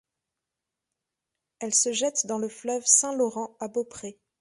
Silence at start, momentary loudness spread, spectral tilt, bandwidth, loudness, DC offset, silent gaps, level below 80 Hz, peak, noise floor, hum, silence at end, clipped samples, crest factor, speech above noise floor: 1.6 s; 18 LU; -1.5 dB/octave; 11.5 kHz; -24 LUFS; under 0.1%; none; -74 dBFS; -4 dBFS; -87 dBFS; none; 0.3 s; under 0.1%; 24 dB; 60 dB